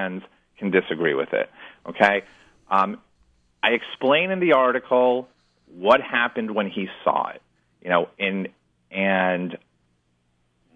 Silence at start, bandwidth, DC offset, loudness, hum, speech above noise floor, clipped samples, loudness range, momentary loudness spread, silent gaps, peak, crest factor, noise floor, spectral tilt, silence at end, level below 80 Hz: 0 s; 9.4 kHz; under 0.1%; -22 LUFS; none; 46 dB; under 0.1%; 4 LU; 14 LU; none; -4 dBFS; 20 dB; -68 dBFS; -6.5 dB/octave; 1.2 s; -68 dBFS